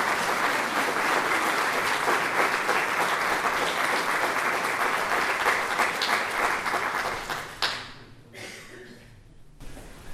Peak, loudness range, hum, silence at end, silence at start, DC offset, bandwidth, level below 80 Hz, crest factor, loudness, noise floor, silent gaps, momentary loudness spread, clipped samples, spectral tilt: -6 dBFS; 6 LU; none; 0 s; 0 s; under 0.1%; 16 kHz; -54 dBFS; 20 dB; -25 LUFS; -49 dBFS; none; 17 LU; under 0.1%; -2 dB/octave